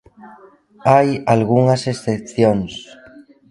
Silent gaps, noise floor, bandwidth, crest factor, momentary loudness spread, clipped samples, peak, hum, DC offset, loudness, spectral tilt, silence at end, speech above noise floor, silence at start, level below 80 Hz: none; -46 dBFS; 11.5 kHz; 18 dB; 9 LU; under 0.1%; 0 dBFS; none; under 0.1%; -16 LUFS; -7 dB/octave; 0.7 s; 30 dB; 0.25 s; -50 dBFS